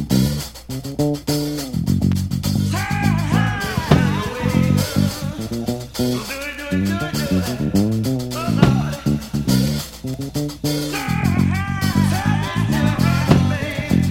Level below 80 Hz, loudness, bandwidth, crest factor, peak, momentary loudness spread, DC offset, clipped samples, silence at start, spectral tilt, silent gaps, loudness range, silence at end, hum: -36 dBFS; -20 LUFS; 17 kHz; 18 dB; 0 dBFS; 9 LU; under 0.1%; under 0.1%; 0 s; -6 dB/octave; none; 3 LU; 0 s; none